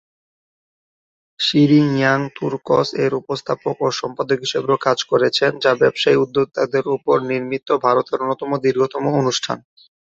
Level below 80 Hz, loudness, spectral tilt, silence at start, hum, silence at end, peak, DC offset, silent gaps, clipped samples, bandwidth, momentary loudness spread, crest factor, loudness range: -60 dBFS; -18 LUFS; -5 dB/octave; 1.4 s; none; 0.55 s; -2 dBFS; under 0.1%; none; under 0.1%; 7.8 kHz; 8 LU; 16 dB; 2 LU